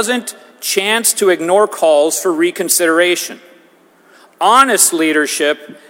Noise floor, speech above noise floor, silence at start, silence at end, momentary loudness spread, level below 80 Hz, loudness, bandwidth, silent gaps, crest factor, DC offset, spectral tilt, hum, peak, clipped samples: -48 dBFS; 35 dB; 0 s; 0.15 s; 9 LU; -64 dBFS; -12 LUFS; over 20 kHz; none; 14 dB; under 0.1%; -1.5 dB/octave; none; 0 dBFS; under 0.1%